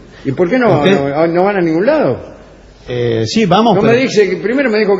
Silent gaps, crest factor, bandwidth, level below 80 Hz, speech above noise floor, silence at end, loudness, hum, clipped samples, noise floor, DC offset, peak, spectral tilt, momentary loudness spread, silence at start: none; 12 dB; 8 kHz; -44 dBFS; 26 dB; 0 s; -12 LUFS; none; 0.1%; -38 dBFS; under 0.1%; 0 dBFS; -6 dB/octave; 7 LU; 0.15 s